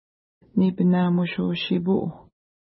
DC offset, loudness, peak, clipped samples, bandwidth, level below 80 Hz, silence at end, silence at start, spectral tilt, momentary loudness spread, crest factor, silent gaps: under 0.1%; -23 LUFS; -10 dBFS; under 0.1%; 5.8 kHz; -60 dBFS; 0.5 s; 0.55 s; -12 dB/octave; 6 LU; 14 dB; none